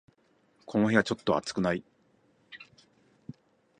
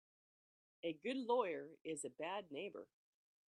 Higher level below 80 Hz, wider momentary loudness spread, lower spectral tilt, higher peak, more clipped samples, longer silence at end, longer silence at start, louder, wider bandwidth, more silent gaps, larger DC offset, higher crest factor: first, -64 dBFS vs under -90 dBFS; first, 25 LU vs 12 LU; first, -5.5 dB/octave vs -3.5 dB/octave; first, -8 dBFS vs -26 dBFS; neither; first, 1.15 s vs 0.65 s; second, 0.7 s vs 0.85 s; first, -28 LUFS vs -44 LUFS; about the same, 10 kHz vs 10.5 kHz; second, none vs 1.81-1.85 s; neither; about the same, 24 dB vs 20 dB